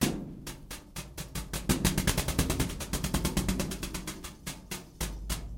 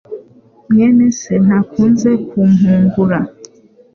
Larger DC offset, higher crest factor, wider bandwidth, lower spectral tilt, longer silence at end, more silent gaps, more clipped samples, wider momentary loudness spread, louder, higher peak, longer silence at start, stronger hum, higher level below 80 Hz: neither; first, 22 dB vs 10 dB; first, 17 kHz vs 7 kHz; second, -4 dB/octave vs -8 dB/octave; second, 0 s vs 0.5 s; neither; neither; first, 14 LU vs 9 LU; second, -33 LUFS vs -12 LUFS; second, -12 dBFS vs -2 dBFS; about the same, 0 s vs 0.1 s; neither; first, -38 dBFS vs -48 dBFS